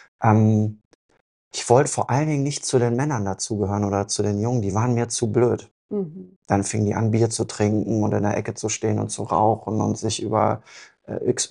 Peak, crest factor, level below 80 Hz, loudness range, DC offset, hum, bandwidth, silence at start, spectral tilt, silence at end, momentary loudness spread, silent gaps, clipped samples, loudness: -2 dBFS; 20 dB; -58 dBFS; 2 LU; under 0.1%; none; 11.5 kHz; 0.2 s; -5.5 dB/octave; 0.05 s; 10 LU; 0.85-1.09 s, 1.21-1.51 s, 5.71-5.89 s, 6.36-6.42 s; under 0.1%; -22 LUFS